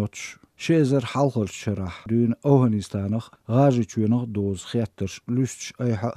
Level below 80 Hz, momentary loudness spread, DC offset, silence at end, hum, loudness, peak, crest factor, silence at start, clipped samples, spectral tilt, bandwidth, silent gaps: -58 dBFS; 11 LU; under 0.1%; 0 s; none; -24 LUFS; -4 dBFS; 18 dB; 0 s; under 0.1%; -7 dB/octave; 13 kHz; none